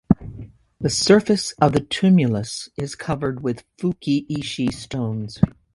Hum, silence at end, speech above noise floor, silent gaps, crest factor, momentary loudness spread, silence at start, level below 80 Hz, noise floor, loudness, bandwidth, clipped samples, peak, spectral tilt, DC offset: none; 0.25 s; 19 dB; none; 20 dB; 13 LU; 0.1 s; -44 dBFS; -40 dBFS; -21 LUFS; 11.5 kHz; under 0.1%; 0 dBFS; -5.5 dB/octave; under 0.1%